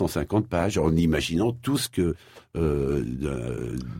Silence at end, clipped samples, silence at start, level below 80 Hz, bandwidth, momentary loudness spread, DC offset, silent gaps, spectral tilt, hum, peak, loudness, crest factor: 0 s; under 0.1%; 0 s; -40 dBFS; 16.5 kHz; 8 LU; under 0.1%; none; -6 dB/octave; none; -10 dBFS; -26 LUFS; 16 dB